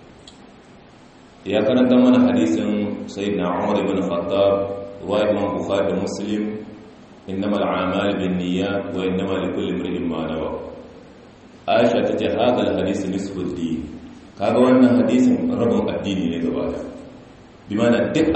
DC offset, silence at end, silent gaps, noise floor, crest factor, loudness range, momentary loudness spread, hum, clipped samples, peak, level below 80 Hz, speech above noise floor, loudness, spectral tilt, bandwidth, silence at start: under 0.1%; 0 s; none; -46 dBFS; 18 dB; 5 LU; 14 LU; none; under 0.1%; -4 dBFS; -50 dBFS; 27 dB; -20 LUFS; -6.5 dB/octave; 8.4 kHz; 0 s